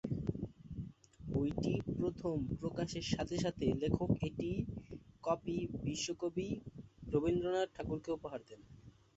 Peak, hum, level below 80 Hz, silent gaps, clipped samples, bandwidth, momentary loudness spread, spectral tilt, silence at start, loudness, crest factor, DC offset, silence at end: -16 dBFS; none; -54 dBFS; none; under 0.1%; 8 kHz; 14 LU; -6.5 dB/octave; 0.05 s; -39 LUFS; 22 dB; under 0.1%; 0.25 s